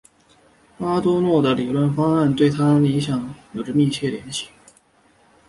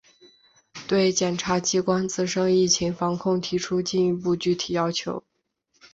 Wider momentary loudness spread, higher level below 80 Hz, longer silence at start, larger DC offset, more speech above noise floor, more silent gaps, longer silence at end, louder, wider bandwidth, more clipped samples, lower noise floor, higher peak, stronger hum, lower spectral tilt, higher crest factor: first, 12 LU vs 6 LU; about the same, -54 dBFS vs -58 dBFS; about the same, 0.8 s vs 0.75 s; neither; second, 38 dB vs 47 dB; neither; first, 1 s vs 0.05 s; first, -20 LUFS vs -24 LUFS; first, 11.5 kHz vs 8 kHz; neither; second, -57 dBFS vs -71 dBFS; first, -4 dBFS vs -8 dBFS; neither; first, -7 dB/octave vs -4 dB/octave; about the same, 16 dB vs 18 dB